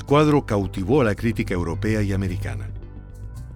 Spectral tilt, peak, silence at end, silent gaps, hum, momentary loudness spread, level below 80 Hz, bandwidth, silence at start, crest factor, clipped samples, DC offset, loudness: -7.5 dB/octave; -6 dBFS; 0 s; none; none; 20 LU; -36 dBFS; 15 kHz; 0 s; 16 dB; under 0.1%; under 0.1%; -22 LUFS